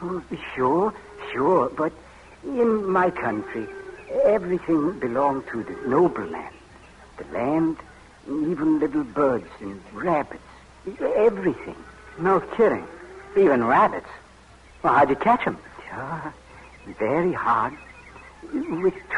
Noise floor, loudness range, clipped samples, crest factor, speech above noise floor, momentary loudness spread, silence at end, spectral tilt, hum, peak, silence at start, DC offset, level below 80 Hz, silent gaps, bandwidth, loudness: -49 dBFS; 4 LU; under 0.1%; 18 dB; 27 dB; 20 LU; 0 s; -7.5 dB/octave; none; -6 dBFS; 0 s; under 0.1%; -54 dBFS; none; 11 kHz; -23 LUFS